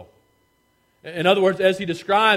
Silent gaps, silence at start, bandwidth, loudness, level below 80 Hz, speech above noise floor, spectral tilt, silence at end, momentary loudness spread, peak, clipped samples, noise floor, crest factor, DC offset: none; 0 s; 15 kHz; -19 LUFS; -64 dBFS; 46 dB; -5 dB/octave; 0 s; 15 LU; -2 dBFS; under 0.1%; -64 dBFS; 18 dB; under 0.1%